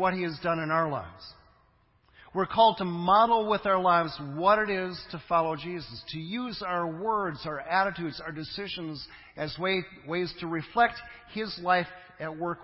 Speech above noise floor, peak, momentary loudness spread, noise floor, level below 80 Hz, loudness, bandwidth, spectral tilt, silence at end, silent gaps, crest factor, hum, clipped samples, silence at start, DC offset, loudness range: 36 dB; -8 dBFS; 15 LU; -65 dBFS; -60 dBFS; -28 LUFS; 5.8 kHz; -9.5 dB/octave; 0 s; none; 20 dB; none; under 0.1%; 0 s; under 0.1%; 7 LU